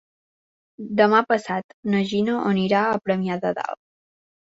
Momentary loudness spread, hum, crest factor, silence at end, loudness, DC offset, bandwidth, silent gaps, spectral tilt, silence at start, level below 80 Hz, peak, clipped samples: 12 LU; none; 20 dB; 0.7 s; -22 LUFS; under 0.1%; 8 kHz; 1.64-1.83 s; -6.5 dB/octave; 0.8 s; -64 dBFS; -2 dBFS; under 0.1%